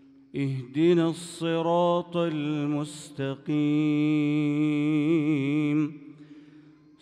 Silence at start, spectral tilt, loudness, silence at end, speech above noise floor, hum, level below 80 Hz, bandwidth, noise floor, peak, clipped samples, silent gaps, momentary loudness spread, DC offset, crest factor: 0.35 s; -7 dB/octave; -26 LUFS; 0.6 s; 28 dB; none; -76 dBFS; 11 kHz; -53 dBFS; -12 dBFS; under 0.1%; none; 9 LU; under 0.1%; 14 dB